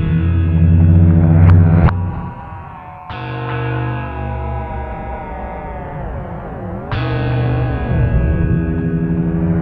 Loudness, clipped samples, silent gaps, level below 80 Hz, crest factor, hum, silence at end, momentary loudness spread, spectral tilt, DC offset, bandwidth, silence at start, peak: -16 LUFS; under 0.1%; none; -24 dBFS; 14 dB; none; 0 s; 17 LU; -11.5 dB/octave; under 0.1%; 4.6 kHz; 0 s; 0 dBFS